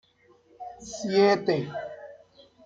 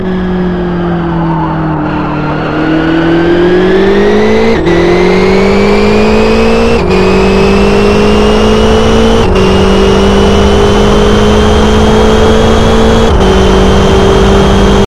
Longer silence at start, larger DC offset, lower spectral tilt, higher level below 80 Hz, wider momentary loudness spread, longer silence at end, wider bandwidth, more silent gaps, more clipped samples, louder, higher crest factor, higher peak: first, 0.6 s vs 0 s; second, under 0.1% vs 10%; about the same, -5 dB/octave vs -6 dB/octave; second, -66 dBFS vs -14 dBFS; first, 23 LU vs 6 LU; first, 0.5 s vs 0 s; second, 7.8 kHz vs 13 kHz; neither; second, under 0.1% vs 1%; second, -25 LUFS vs -7 LUFS; first, 20 dB vs 6 dB; second, -8 dBFS vs 0 dBFS